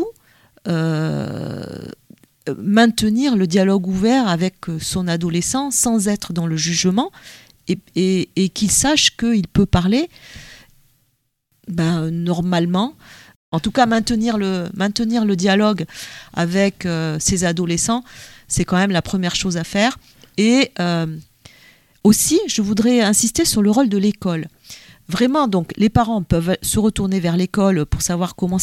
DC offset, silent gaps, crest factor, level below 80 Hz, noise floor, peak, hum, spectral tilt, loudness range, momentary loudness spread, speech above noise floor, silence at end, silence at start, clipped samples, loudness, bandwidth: under 0.1%; 13.36-13.52 s; 18 dB; -40 dBFS; -67 dBFS; 0 dBFS; none; -4.5 dB/octave; 3 LU; 13 LU; 49 dB; 0 s; 0 s; under 0.1%; -18 LUFS; 15.5 kHz